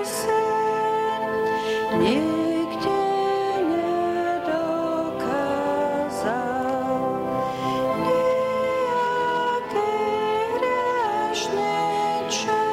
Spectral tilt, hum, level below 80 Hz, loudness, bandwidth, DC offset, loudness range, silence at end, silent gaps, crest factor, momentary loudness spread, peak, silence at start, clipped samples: -4.5 dB/octave; none; -58 dBFS; -23 LUFS; 16 kHz; under 0.1%; 2 LU; 0 s; none; 12 dB; 3 LU; -10 dBFS; 0 s; under 0.1%